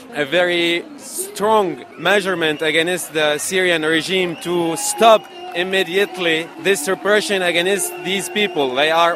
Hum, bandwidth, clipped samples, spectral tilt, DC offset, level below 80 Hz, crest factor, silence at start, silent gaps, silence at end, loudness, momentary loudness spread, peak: none; 16 kHz; under 0.1%; -2.5 dB/octave; under 0.1%; -64 dBFS; 18 dB; 0 s; none; 0 s; -17 LUFS; 6 LU; 0 dBFS